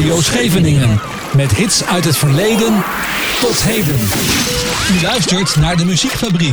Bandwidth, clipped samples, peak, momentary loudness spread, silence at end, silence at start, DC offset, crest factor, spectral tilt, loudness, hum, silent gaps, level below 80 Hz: over 20 kHz; under 0.1%; -2 dBFS; 3 LU; 0 s; 0 s; 0.4%; 12 dB; -4 dB/octave; -13 LUFS; none; none; -32 dBFS